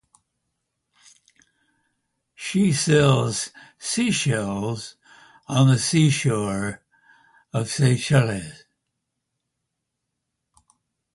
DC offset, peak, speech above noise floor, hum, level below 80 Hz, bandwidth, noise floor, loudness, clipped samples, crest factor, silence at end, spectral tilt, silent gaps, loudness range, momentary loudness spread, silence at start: under 0.1%; -4 dBFS; 60 dB; none; -56 dBFS; 11.5 kHz; -80 dBFS; -22 LUFS; under 0.1%; 20 dB; 2.6 s; -5 dB/octave; none; 4 LU; 16 LU; 2.4 s